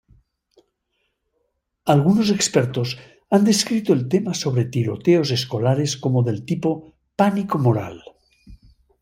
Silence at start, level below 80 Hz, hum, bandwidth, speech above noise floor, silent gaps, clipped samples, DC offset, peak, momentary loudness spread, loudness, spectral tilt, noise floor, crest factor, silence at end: 1.85 s; -56 dBFS; none; 16 kHz; 53 dB; none; under 0.1%; under 0.1%; -2 dBFS; 9 LU; -20 LUFS; -5.5 dB/octave; -73 dBFS; 18 dB; 0.45 s